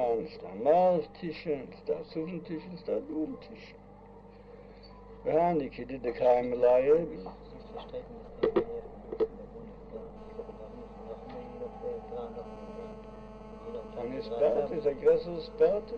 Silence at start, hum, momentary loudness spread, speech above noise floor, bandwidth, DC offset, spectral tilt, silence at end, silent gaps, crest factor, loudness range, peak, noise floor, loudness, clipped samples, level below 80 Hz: 0 s; 50 Hz at -55 dBFS; 21 LU; 22 dB; 6.2 kHz; under 0.1%; -8.5 dB/octave; 0 s; none; 18 dB; 13 LU; -14 dBFS; -51 dBFS; -31 LUFS; under 0.1%; -54 dBFS